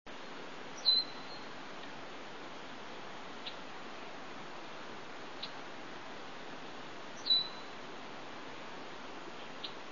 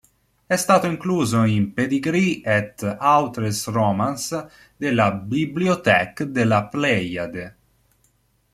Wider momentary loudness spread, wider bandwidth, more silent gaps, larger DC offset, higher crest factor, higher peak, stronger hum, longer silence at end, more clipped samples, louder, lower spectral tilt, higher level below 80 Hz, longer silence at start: first, 17 LU vs 10 LU; second, 7.2 kHz vs 15.5 kHz; neither; first, 0.4% vs under 0.1%; about the same, 22 dB vs 20 dB; second, -18 dBFS vs 0 dBFS; neither; second, 0 s vs 1.05 s; neither; second, -39 LUFS vs -21 LUFS; second, 0.5 dB/octave vs -5.5 dB/octave; second, -76 dBFS vs -56 dBFS; second, 0.05 s vs 0.5 s